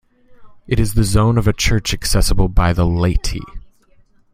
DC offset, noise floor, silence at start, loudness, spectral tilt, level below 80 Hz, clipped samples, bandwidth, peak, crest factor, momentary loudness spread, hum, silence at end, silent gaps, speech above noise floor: under 0.1%; -51 dBFS; 0.3 s; -17 LUFS; -5 dB/octave; -22 dBFS; under 0.1%; 16 kHz; 0 dBFS; 16 dB; 8 LU; none; 0.75 s; none; 37 dB